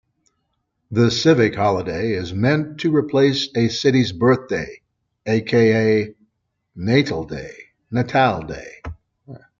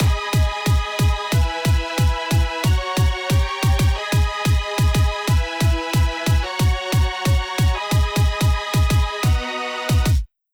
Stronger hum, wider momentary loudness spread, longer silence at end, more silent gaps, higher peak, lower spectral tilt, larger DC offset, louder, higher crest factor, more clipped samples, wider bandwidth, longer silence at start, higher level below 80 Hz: neither; first, 17 LU vs 2 LU; about the same, 0.2 s vs 0.3 s; neither; first, -2 dBFS vs -8 dBFS; about the same, -6 dB/octave vs -5 dB/octave; neither; about the same, -19 LUFS vs -20 LUFS; first, 18 dB vs 10 dB; neither; second, 7.6 kHz vs over 20 kHz; first, 0.9 s vs 0 s; second, -50 dBFS vs -22 dBFS